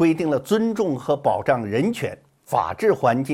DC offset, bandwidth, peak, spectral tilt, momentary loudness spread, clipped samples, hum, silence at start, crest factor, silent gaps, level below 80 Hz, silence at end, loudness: under 0.1%; 16 kHz; -6 dBFS; -6.5 dB/octave; 5 LU; under 0.1%; none; 0 s; 16 dB; none; -60 dBFS; 0 s; -22 LUFS